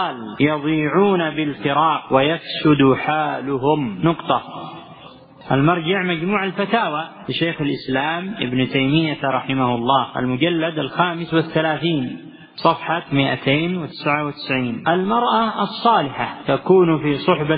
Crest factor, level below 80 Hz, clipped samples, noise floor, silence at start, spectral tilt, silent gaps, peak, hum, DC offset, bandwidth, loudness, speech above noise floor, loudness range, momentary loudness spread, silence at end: 18 dB; -52 dBFS; under 0.1%; -42 dBFS; 0 s; -11.5 dB/octave; none; 0 dBFS; none; under 0.1%; 5.2 kHz; -19 LUFS; 24 dB; 3 LU; 7 LU; 0 s